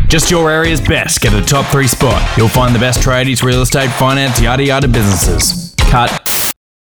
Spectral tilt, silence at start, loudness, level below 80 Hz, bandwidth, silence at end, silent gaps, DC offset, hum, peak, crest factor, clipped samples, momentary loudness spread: -4 dB/octave; 0 s; -11 LUFS; -18 dBFS; over 20 kHz; 0.35 s; none; under 0.1%; none; -2 dBFS; 10 dB; under 0.1%; 2 LU